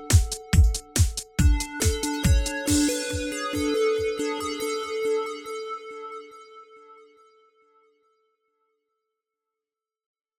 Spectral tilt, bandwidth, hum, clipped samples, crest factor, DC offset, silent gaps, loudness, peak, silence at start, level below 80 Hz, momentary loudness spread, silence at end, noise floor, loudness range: -4.5 dB/octave; 17.5 kHz; none; under 0.1%; 20 dB; under 0.1%; none; -25 LUFS; -6 dBFS; 0 s; -32 dBFS; 13 LU; 3.45 s; under -90 dBFS; 17 LU